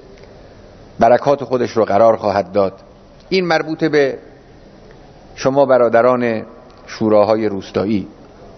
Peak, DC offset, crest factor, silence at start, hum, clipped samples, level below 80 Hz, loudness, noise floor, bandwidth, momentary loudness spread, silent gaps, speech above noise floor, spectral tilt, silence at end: 0 dBFS; under 0.1%; 16 dB; 1 s; none; under 0.1%; -50 dBFS; -15 LUFS; -42 dBFS; 6.4 kHz; 9 LU; none; 27 dB; -6.5 dB/octave; 0.05 s